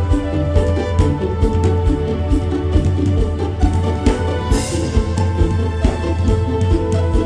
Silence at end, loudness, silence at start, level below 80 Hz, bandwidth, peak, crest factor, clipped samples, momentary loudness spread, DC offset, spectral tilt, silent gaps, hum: 0 s; -18 LUFS; 0 s; -20 dBFS; 11 kHz; 0 dBFS; 14 dB; under 0.1%; 2 LU; under 0.1%; -7 dB/octave; none; none